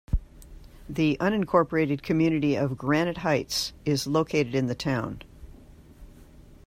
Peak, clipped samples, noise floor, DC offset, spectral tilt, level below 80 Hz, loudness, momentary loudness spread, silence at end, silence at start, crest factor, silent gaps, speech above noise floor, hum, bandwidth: -8 dBFS; under 0.1%; -50 dBFS; under 0.1%; -5.5 dB/octave; -42 dBFS; -26 LUFS; 8 LU; 0.1 s; 0.1 s; 18 dB; none; 24 dB; none; 16 kHz